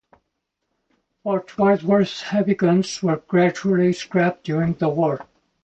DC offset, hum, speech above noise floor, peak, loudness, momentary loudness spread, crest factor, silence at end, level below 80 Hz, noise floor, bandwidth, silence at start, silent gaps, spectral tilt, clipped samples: under 0.1%; none; 57 dB; -6 dBFS; -20 LUFS; 7 LU; 16 dB; 0.4 s; -58 dBFS; -77 dBFS; 8.6 kHz; 1.25 s; none; -6.5 dB/octave; under 0.1%